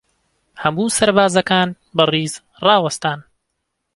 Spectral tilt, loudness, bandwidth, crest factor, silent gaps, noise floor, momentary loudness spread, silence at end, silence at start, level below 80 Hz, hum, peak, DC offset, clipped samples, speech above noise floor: -4 dB/octave; -17 LUFS; 11.5 kHz; 18 dB; none; -74 dBFS; 9 LU; 0.75 s; 0.55 s; -54 dBFS; none; 0 dBFS; under 0.1%; under 0.1%; 58 dB